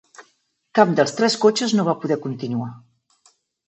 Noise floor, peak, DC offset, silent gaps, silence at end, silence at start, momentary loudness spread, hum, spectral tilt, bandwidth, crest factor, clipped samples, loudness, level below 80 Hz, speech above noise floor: -65 dBFS; 0 dBFS; under 0.1%; none; 0.9 s; 0.2 s; 10 LU; none; -5 dB/octave; 8.4 kHz; 20 dB; under 0.1%; -20 LUFS; -72 dBFS; 46 dB